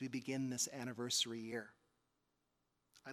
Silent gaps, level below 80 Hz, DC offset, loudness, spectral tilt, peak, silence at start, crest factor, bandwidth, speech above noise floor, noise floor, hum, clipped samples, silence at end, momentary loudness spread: none; -86 dBFS; under 0.1%; -41 LUFS; -2.5 dB/octave; -24 dBFS; 0 s; 20 dB; 16 kHz; 42 dB; -85 dBFS; none; under 0.1%; 0 s; 14 LU